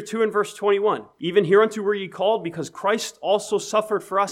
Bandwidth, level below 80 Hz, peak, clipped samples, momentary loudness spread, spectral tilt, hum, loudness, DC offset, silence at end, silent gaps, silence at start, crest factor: 14 kHz; -74 dBFS; -6 dBFS; under 0.1%; 7 LU; -4.5 dB/octave; none; -22 LUFS; under 0.1%; 0 s; none; 0 s; 16 dB